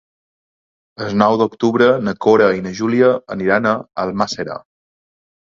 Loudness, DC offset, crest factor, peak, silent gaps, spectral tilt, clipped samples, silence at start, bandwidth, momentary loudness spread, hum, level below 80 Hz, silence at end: -16 LUFS; under 0.1%; 18 dB; 0 dBFS; none; -6 dB/octave; under 0.1%; 1 s; 7.6 kHz; 10 LU; none; -54 dBFS; 1 s